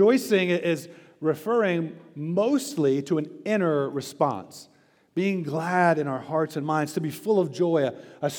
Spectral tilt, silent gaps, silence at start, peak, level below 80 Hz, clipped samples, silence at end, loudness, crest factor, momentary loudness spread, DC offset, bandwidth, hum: -6 dB/octave; none; 0 s; -8 dBFS; -82 dBFS; under 0.1%; 0 s; -25 LUFS; 18 dB; 9 LU; under 0.1%; over 20 kHz; none